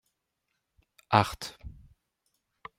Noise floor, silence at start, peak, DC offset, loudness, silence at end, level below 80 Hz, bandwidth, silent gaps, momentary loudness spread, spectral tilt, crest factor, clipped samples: -81 dBFS; 1.1 s; -4 dBFS; under 0.1%; -28 LUFS; 1.1 s; -56 dBFS; 16 kHz; none; 25 LU; -5 dB/octave; 30 dB; under 0.1%